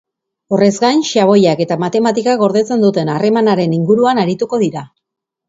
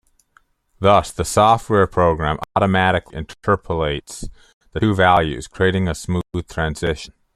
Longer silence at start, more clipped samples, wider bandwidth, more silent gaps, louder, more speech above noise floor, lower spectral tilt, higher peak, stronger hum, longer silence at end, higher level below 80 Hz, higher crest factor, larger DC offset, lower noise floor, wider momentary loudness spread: second, 0.5 s vs 0.8 s; neither; second, 8 kHz vs 13.5 kHz; second, none vs 4.54-4.61 s; first, -13 LUFS vs -18 LUFS; first, 66 dB vs 40 dB; about the same, -6 dB/octave vs -5.5 dB/octave; about the same, 0 dBFS vs 0 dBFS; neither; first, 0.65 s vs 0.3 s; second, -58 dBFS vs -38 dBFS; about the same, 14 dB vs 18 dB; neither; first, -79 dBFS vs -59 dBFS; second, 5 LU vs 13 LU